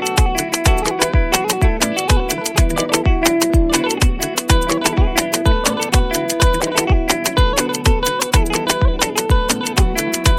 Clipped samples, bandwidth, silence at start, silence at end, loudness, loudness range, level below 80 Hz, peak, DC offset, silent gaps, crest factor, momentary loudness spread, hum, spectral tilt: under 0.1%; 17 kHz; 0 s; 0 s; -16 LUFS; 0 LU; -20 dBFS; 0 dBFS; under 0.1%; none; 16 dB; 2 LU; none; -4 dB/octave